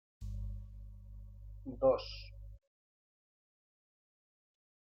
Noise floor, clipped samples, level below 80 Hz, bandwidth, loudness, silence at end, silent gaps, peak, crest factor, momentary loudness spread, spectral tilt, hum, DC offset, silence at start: under -90 dBFS; under 0.1%; -52 dBFS; 6.6 kHz; -37 LUFS; 2.4 s; none; -18 dBFS; 24 dB; 22 LU; -7.5 dB/octave; 50 Hz at -55 dBFS; under 0.1%; 0.2 s